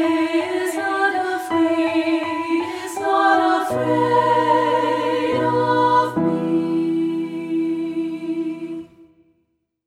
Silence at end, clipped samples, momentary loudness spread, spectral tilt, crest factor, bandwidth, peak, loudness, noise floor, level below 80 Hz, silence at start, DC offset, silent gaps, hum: 0.85 s; under 0.1%; 9 LU; -5.5 dB/octave; 16 dB; 14 kHz; -4 dBFS; -20 LUFS; -69 dBFS; -62 dBFS; 0 s; under 0.1%; none; none